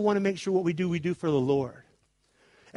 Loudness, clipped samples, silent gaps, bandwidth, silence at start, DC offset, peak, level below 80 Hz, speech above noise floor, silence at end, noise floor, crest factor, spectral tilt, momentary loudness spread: -28 LUFS; under 0.1%; none; 11.5 kHz; 0 s; under 0.1%; -12 dBFS; -64 dBFS; 41 dB; 0.95 s; -68 dBFS; 16 dB; -7 dB/octave; 3 LU